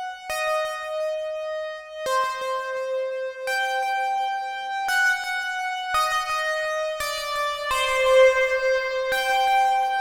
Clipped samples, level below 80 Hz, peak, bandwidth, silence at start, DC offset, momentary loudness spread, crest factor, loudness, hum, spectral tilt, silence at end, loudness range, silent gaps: under 0.1%; -54 dBFS; -6 dBFS; over 20 kHz; 0 s; under 0.1%; 10 LU; 18 dB; -23 LUFS; none; 0.5 dB/octave; 0 s; 6 LU; none